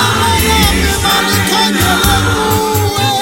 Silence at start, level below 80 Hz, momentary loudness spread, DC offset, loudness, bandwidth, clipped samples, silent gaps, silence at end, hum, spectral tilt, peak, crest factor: 0 s; -24 dBFS; 3 LU; under 0.1%; -11 LUFS; 17 kHz; under 0.1%; none; 0 s; none; -3.5 dB/octave; 0 dBFS; 12 dB